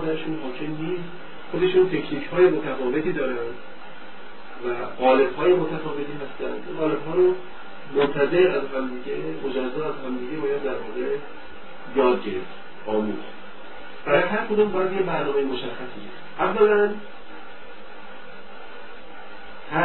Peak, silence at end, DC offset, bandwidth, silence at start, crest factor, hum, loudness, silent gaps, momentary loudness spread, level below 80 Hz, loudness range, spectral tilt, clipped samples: -4 dBFS; 0 s; 3%; 4.3 kHz; 0 s; 20 dB; none; -24 LUFS; none; 22 LU; -54 dBFS; 4 LU; -10 dB/octave; under 0.1%